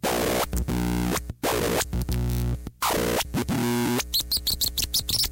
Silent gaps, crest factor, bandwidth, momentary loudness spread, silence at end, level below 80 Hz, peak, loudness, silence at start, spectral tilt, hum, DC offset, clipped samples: none; 14 dB; 17 kHz; 5 LU; 0 s; -34 dBFS; -12 dBFS; -25 LUFS; 0.05 s; -3.5 dB/octave; none; under 0.1%; under 0.1%